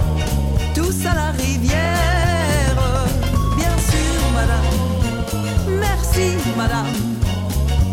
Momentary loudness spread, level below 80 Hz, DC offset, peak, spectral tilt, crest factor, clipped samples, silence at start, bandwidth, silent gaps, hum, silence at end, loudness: 3 LU; -22 dBFS; under 0.1%; -6 dBFS; -5 dB/octave; 12 dB; under 0.1%; 0 s; 17 kHz; none; none; 0 s; -19 LUFS